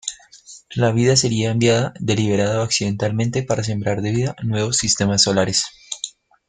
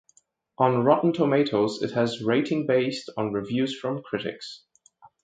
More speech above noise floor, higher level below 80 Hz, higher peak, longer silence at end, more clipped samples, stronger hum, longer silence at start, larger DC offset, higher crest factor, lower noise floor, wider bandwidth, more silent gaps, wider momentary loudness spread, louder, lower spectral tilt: second, 26 dB vs 39 dB; first, -50 dBFS vs -66 dBFS; about the same, -2 dBFS vs -4 dBFS; first, 0.4 s vs 0.15 s; neither; neither; second, 0.05 s vs 0.6 s; neither; about the same, 18 dB vs 22 dB; second, -44 dBFS vs -63 dBFS; about the same, 9.8 kHz vs 9.2 kHz; neither; about the same, 12 LU vs 10 LU; first, -19 LUFS vs -25 LUFS; second, -4 dB/octave vs -6.5 dB/octave